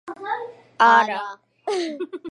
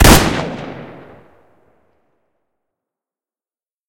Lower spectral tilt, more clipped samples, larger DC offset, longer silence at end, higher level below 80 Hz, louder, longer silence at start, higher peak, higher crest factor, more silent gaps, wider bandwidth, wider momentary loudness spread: about the same, -3 dB/octave vs -4 dB/octave; second, under 0.1% vs 0.3%; neither; second, 0 s vs 3 s; second, -82 dBFS vs -24 dBFS; second, -21 LUFS vs -14 LUFS; about the same, 0.05 s vs 0 s; about the same, -2 dBFS vs 0 dBFS; about the same, 20 dB vs 18 dB; neither; second, 11 kHz vs 16.5 kHz; second, 19 LU vs 27 LU